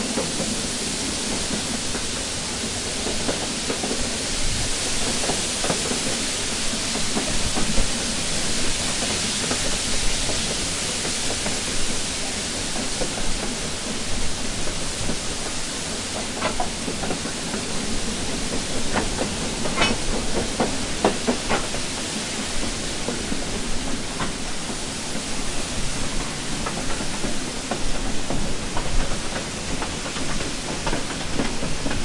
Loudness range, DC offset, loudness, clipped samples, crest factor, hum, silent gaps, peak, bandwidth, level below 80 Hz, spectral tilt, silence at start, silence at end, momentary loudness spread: 5 LU; under 0.1%; -24 LUFS; under 0.1%; 20 dB; none; none; -4 dBFS; 11.5 kHz; -32 dBFS; -2.5 dB/octave; 0 s; 0 s; 5 LU